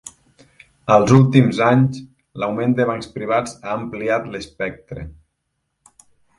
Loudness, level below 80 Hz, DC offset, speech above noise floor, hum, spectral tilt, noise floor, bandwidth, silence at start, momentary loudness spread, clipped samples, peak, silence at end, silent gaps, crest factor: -18 LUFS; -48 dBFS; under 0.1%; 56 dB; none; -7 dB/octave; -74 dBFS; 11.5 kHz; 0.05 s; 22 LU; under 0.1%; 0 dBFS; 1.25 s; none; 20 dB